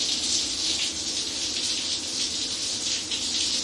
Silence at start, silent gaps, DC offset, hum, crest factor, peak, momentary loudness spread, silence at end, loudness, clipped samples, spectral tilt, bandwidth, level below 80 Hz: 0 s; none; under 0.1%; none; 16 dB; -10 dBFS; 3 LU; 0 s; -25 LUFS; under 0.1%; 0.5 dB/octave; 11.5 kHz; -56 dBFS